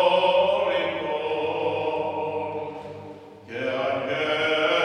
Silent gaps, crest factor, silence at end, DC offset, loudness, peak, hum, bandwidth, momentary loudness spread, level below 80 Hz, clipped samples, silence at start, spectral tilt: none; 18 dB; 0 s; under 0.1%; -25 LUFS; -6 dBFS; none; 9.6 kHz; 17 LU; -66 dBFS; under 0.1%; 0 s; -5 dB/octave